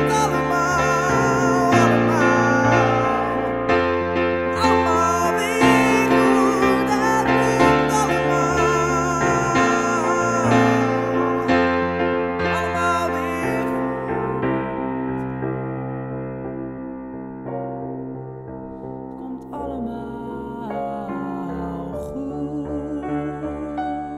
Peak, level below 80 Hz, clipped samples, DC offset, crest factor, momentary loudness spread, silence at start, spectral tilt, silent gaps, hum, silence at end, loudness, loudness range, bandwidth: -2 dBFS; -44 dBFS; under 0.1%; under 0.1%; 18 dB; 15 LU; 0 s; -5.5 dB/octave; none; none; 0 s; -20 LUFS; 13 LU; 15.5 kHz